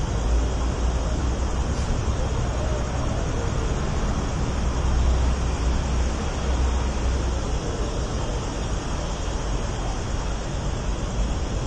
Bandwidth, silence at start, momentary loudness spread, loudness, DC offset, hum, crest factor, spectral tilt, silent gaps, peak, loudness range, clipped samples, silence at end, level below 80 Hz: 9.4 kHz; 0 s; 4 LU; -26 LUFS; under 0.1%; none; 12 dB; -5.5 dB/octave; none; -12 dBFS; 3 LU; under 0.1%; 0 s; -26 dBFS